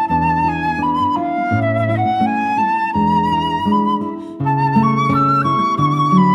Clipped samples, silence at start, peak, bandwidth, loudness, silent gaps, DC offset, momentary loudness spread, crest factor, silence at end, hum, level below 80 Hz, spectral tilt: under 0.1%; 0 s; -2 dBFS; 11.5 kHz; -16 LUFS; none; under 0.1%; 4 LU; 14 dB; 0 s; none; -42 dBFS; -8 dB/octave